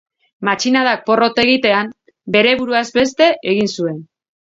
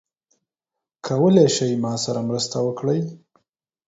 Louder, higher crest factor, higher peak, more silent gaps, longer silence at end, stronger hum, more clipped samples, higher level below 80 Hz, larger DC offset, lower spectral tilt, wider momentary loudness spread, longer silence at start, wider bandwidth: first, -15 LUFS vs -20 LUFS; about the same, 16 dB vs 20 dB; about the same, 0 dBFS vs -2 dBFS; neither; second, 0.55 s vs 0.7 s; neither; neither; first, -56 dBFS vs -62 dBFS; neither; second, -4 dB/octave vs -5.5 dB/octave; about the same, 10 LU vs 11 LU; second, 0.4 s vs 1.05 s; about the same, 7.8 kHz vs 8 kHz